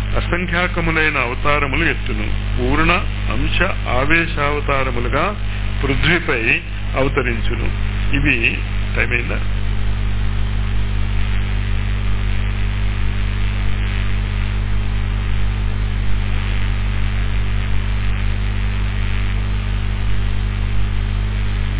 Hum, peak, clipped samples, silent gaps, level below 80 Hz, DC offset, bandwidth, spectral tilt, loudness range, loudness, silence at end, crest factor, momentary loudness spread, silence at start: 50 Hz at -20 dBFS; -2 dBFS; under 0.1%; none; -20 dBFS; under 0.1%; 4 kHz; -10 dB/octave; 4 LU; -20 LUFS; 0 s; 16 dB; 7 LU; 0 s